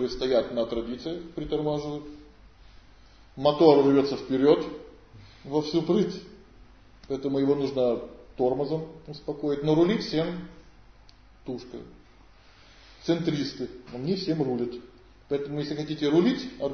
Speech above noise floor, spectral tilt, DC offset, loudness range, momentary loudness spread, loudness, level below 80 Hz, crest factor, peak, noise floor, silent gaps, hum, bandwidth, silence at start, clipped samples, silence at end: 29 dB; -7 dB/octave; under 0.1%; 9 LU; 17 LU; -26 LUFS; -54 dBFS; 24 dB; -4 dBFS; -54 dBFS; none; none; 6.6 kHz; 0 s; under 0.1%; 0 s